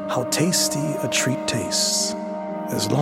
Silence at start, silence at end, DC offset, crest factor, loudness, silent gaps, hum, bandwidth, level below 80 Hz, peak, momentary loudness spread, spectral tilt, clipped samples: 0 s; 0 s; under 0.1%; 16 dB; -22 LUFS; none; none; 16.5 kHz; -58 dBFS; -6 dBFS; 9 LU; -3 dB/octave; under 0.1%